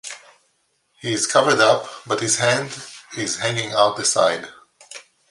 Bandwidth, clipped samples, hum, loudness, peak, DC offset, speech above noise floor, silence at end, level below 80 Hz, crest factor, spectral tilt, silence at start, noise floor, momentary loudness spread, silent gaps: 11.5 kHz; under 0.1%; none; -19 LUFS; -2 dBFS; under 0.1%; 47 dB; 0.3 s; -66 dBFS; 20 dB; -2.5 dB/octave; 0.05 s; -67 dBFS; 23 LU; none